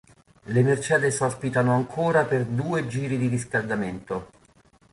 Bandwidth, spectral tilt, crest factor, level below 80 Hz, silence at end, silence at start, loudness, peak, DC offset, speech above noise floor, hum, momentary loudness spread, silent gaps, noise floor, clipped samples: 11.5 kHz; -6 dB/octave; 18 dB; -56 dBFS; 0.7 s; 0.45 s; -24 LUFS; -8 dBFS; under 0.1%; 34 dB; none; 8 LU; none; -58 dBFS; under 0.1%